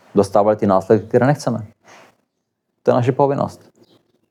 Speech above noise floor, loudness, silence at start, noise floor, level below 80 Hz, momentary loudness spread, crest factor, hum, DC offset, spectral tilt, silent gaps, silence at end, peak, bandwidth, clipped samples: 58 dB; -17 LUFS; 0.15 s; -74 dBFS; -70 dBFS; 10 LU; 18 dB; none; under 0.1%; -7.5 dB/octave; none; 0.75 s; -2 dBFS; 13.5 kHz; under 0.1%